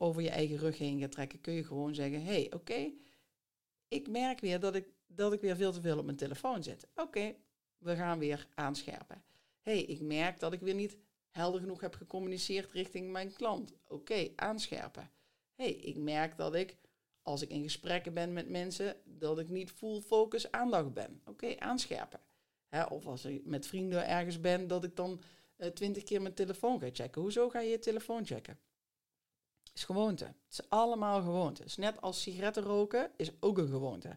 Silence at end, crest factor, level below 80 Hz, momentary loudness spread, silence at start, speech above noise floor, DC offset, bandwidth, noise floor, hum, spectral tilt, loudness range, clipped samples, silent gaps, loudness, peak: 0 s; 20 dB; -72 dBFS; 10 LU; 0 s; over 53 dB; under 0.1%; 16.5 kHz; under -90 dBFS; none; -5 dB/octave; 4 LU; under 0.1%; none; -37 LUFS; -18 dBFS